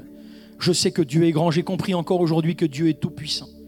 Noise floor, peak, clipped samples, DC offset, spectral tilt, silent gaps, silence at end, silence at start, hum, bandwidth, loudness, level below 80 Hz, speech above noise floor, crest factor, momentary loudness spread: -43 dBFS; -8 dBFS; under 0.1%; under 0.1%; -5.5 dB/octave; none; 0 s; 0 s; none; 16.5 kHz; -22 LUFS; -58 dBFS; 22 dB; 14 dB; 7 LU